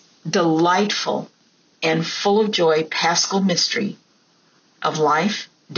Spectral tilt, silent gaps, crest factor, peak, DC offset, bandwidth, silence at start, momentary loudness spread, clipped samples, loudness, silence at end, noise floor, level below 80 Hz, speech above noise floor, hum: -3 dB/octave; none; 14 dB; -6 dBFS; under 0.1%; 7.2 kHz; 0.25 s; 8 LU; under 0.1%; -19 LUFS; 0 s; -58 dBFS; -72 dBFS; 39 dB; none